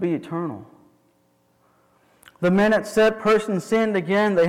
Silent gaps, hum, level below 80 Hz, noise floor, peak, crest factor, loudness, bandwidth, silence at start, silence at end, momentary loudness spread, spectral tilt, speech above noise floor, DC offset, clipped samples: none; none; -58 dBFS; -63 dBFS; -12 dBFS; 10 dB; -21 LUFS; 15.5 kHz; 0 s; 0 s; 11 LU; -6 dB/octave; 43 dB; under 0.1%; under 0.1%